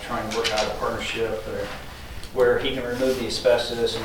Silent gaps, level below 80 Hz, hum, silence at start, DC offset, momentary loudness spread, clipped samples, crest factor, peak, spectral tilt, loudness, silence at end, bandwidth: none; -42 dBFS; none; 0 s; under 0.1%; 12 LU; under 0.1%; 18 dB; -8 dBFS; -3.5 dB/octave; -24 LUFS; 0 s; 19 kHz